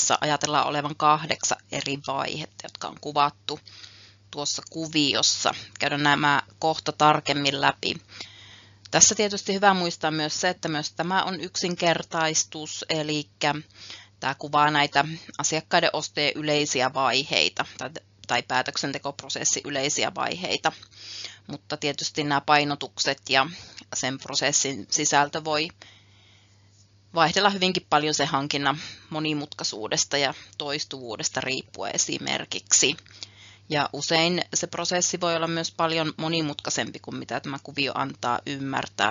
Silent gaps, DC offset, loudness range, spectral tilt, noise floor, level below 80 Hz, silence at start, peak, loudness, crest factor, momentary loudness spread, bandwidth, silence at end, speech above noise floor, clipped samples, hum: none; under 0.1%; 4 LU; -2 dB/octave; -57 dBFS; -66 dBFS; 0 s; 0 dBFS; -24 LUFS; 26 dB; 13 LU; 7.6 kHz; 0 s; 31 dB; under 0.1%; none